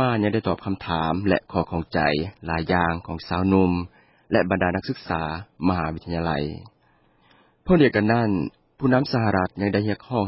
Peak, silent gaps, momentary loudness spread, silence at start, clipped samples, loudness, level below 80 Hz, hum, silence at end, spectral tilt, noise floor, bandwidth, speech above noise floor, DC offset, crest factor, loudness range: -4 dBFS; none; 9 LU; 0 s; under 0.1%; -23 LUFS; -42 dBFS; none; 0 s; -11 dB/octave; -61 dBFS; 5.8 kHz; 39 dB; under 0.1%; 18 dB; 3 LU